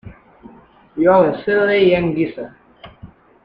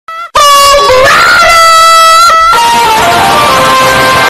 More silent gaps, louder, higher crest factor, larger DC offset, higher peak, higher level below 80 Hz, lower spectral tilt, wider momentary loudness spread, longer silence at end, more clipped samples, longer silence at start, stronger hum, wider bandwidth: neither; second, -15 LUFS vs -3 LUFS; first, 16 dB vs 4 dB; neither; about the same, -2 dBFS vs 0 dBFS; second, -48 dBFS vs -30 dBFS; first, -9 dB/octave vs -1.5 dB/octave; first, 20 LU vs 4 LU; first, 0.4 s vs 0 s; second, under 0.1% vs 0.3%; about the same, 0.05 s vs 0.1 s; neither; second, 5.2 kHz vs 16.5 kHz